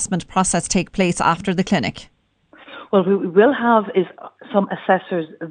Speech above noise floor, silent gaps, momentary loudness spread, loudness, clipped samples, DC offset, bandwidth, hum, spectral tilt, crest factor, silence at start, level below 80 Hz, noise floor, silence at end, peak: 33 dB; none; 12 LU; -19 LUFS; under 0.1%; under 0.1%; 10 kHz; none; -5 dB/octave; 18 dB; 0 s; -46 dBFS; -51 dBFS; 0 s; 0 dBFS